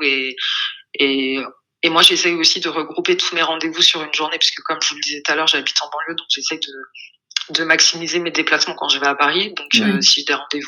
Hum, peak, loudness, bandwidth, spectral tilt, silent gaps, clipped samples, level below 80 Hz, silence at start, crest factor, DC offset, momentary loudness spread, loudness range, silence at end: none; 0 dBFS; -16 LUFS; 19 kHz; -1.5 dB/octave; none; under 0.1%; -74 dBFS; 0 s; 18 dB; under 0.1%; 10 LU; 4 LU; 0 s